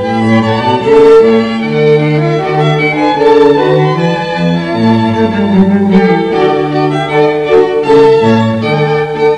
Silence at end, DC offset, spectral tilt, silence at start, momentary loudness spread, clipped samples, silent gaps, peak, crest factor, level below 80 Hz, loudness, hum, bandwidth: 0 s; under 0.1%; -7.5 dB/octave; 0 s; 6 LU; 2%; none; 0 dBFS; 8 dB; -42 dBFS; -9 LUFS; none; 9.6 kHz